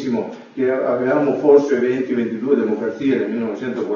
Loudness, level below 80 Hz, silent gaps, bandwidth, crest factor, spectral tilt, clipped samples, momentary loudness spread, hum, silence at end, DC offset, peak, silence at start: -18 LUFS; -66 dBFS; none; 7 kHz; 16 dB; -7.5 dB/octave; under 0.1%; 10 LU; none; 0 s; under 0.1%; -2 dBFS; 0 s